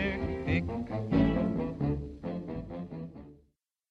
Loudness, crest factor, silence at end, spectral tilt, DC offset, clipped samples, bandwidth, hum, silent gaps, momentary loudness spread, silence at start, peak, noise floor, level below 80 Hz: -32 LUFS; 18 dB; 0.55 s; -9 dB/octave; under 0.1%; under 0.1%; 7.6 kHz; none; none; 14 LU; 0 s; -14 dBFS; -71 dBFS; -44 dBFS